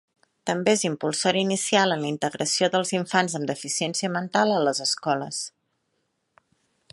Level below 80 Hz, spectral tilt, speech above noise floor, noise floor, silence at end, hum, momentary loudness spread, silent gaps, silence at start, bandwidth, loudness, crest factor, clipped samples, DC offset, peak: -74 dBFS; -3.5 dB/octave; 50 dB; -74 dBFS; 1.45 s; none; 8 LU; none; 0.45 s; 11.5 kHz; -24 LUFS; 20 dB; under 0.1%; under 0.1%; -6 dBFS